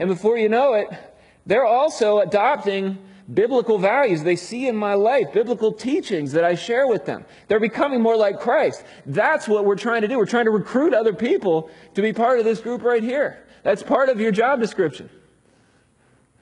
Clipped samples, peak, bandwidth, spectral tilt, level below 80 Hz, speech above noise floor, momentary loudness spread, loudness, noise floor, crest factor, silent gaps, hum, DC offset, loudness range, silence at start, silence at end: under 0.1%; -6 dBFS; 11 kHz; -6 dB/octave; -64 dBFS; 39 dB; 7 LU; -20 LUFS; -59 dBFS; 14 dB; none; none; under 0.1%; 1 LU; 0 s; 1.35 s